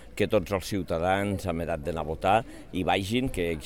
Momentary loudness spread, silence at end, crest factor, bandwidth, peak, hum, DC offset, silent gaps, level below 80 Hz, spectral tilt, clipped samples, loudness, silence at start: 6 LU; 0 s; 18 dB; 18 kHz; -10 dBFS; none; 0.4%; none; -44 dBFS; -5.5 dB/octave; under 0.1%; -28 LUFS; 0 s